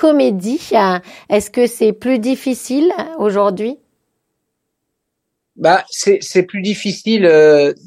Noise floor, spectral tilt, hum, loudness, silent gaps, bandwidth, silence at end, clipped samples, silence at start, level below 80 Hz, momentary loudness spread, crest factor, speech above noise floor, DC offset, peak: -74 dBFS; -5 dB/octave; none; -14 LUFS; none; 15 kHz; 0.15 s; under 0.1%; 0 s; -58 dBFS; 10 LU; 14 dB; 61 dB; under 0.1%; 0 dBFS